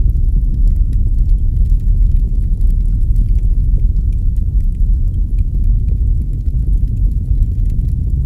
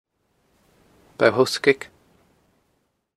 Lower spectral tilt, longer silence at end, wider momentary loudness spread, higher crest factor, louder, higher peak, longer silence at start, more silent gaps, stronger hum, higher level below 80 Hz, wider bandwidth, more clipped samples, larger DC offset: first, -10.5 dB/octave vs -4 dB/octave; second, 0 s vs 1.3 s; second, 2 LU vs 10 LU; second, 12 dB vs 24 dB; first, -17 LUFS vs -20 LUFS; about the same, 0 dBFS vs 0 dBFS; second, 0 s vs 1.2 s; neither; neither; first, -12 dBFS vs -68 dBFS; second, 0.7 kHz vs 13.5 kHz; neither; neither